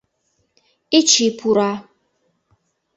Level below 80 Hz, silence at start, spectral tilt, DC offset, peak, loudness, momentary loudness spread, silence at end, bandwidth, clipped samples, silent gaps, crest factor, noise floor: -66 dBFS; 0.9 s; -2.5 dB/octave; under 0.1%; -2 dBFS; -16 LUFS; 10 LU; 1.15 s; 8.2 kHz; under 0.1%; none; 20 dB; -68 dBFS